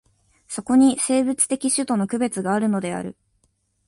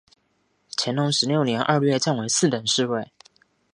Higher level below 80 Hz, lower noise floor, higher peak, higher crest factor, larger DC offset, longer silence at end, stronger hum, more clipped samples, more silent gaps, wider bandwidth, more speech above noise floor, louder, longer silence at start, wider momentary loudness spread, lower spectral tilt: first, -60 dBFS vs -68 dBFS; about the same, -67 dBFS vs -68 dBFS; about the same, -4 dBFS vs -4 dBFS; about the same, 18 dB vs 20 dB; neither; about the same, 0.75 s vs 0.7 s; neither; neither; neither; about the same, 11.5 kHz vs 11.5 kHz; about the same, 47 dB vs 47 dB; about the same, -21 LUFS vs -22 LUFS; second, 0.5 s vs 0.8 s; first, 14 LU vs 8 LU; about the same, -4 dB/octave vs -4 dB/octave